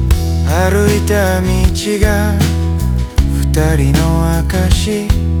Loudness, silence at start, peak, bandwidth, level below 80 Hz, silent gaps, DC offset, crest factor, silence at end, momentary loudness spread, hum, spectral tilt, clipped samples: -14 LUFS; 0 s; 0 dBFS; 20 kHz; -16 dBFS; none; under 0.1%; 12 dB; 0 s; 3 LU; none; -6 dB/octave; under 0.1%